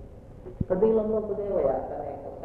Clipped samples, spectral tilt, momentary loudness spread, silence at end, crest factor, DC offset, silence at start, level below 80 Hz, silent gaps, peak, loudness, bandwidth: under 0.1%; -11 dB/octave; 22 LU; 0 s; 16 dB; under 0.1%; 0 s; -46 dBFS; none; -12 dBFS; -27 LUFS; 3.5 kHz